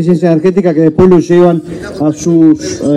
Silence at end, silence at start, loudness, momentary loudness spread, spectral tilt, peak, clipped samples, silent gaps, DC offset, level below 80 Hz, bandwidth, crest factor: 0 s; 0 s; -9 LUFS; 9 LU; -7.5 dB/octave; 0 dBFS; 0.5%; none; under 0.1%; -38 dBFS; 11 kHz; 8 dB